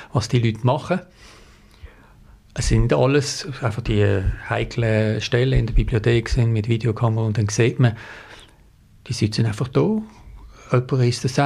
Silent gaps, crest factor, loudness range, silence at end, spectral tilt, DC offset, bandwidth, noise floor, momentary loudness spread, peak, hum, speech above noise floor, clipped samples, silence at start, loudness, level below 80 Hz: none; 16 dB; 3 LU; 0 s; -6 dB/octave; under 0.1%; 11.5 kHz; -51 dBFS; 8 LU; -6 dBFS; none; 31 dB; under 0.1%; 0 s; -21 LUFS; -32 dBFS